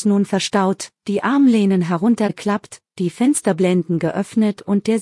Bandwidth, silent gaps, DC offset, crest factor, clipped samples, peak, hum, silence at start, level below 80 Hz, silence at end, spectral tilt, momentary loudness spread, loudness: 12 kHz; none; under 0.1%; 14 dB; under 0.1%; -2 dBFS; none; 0 s; -62 dBFS; 0 s; -6 dB/octave; 9 LU; -18 LUFS